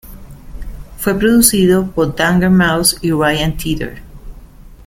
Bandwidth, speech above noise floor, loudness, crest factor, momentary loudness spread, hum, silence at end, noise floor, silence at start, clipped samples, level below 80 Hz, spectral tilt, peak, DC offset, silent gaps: 17 kHz; 24 dB; -13 LUFS; 14 dB; 21 LU; none; 0.1 s; -37 dBFS; 0.05 s; under 0.1%; -32 dBFS; -4.5 dB/octave; 0 dBFS; under 0.1%; none